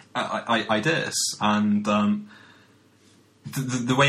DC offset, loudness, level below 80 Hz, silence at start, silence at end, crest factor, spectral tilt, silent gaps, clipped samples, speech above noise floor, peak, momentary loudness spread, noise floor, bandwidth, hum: under 0.1%; -24 LUFS; -64 dBFS; 0.15 s; 0 s; 20 dB; -4 dB/octave; none; under 0.1%; 34 dB; -6 dBFS; 9 LU; -57 dBFS; 14.5 kHz; none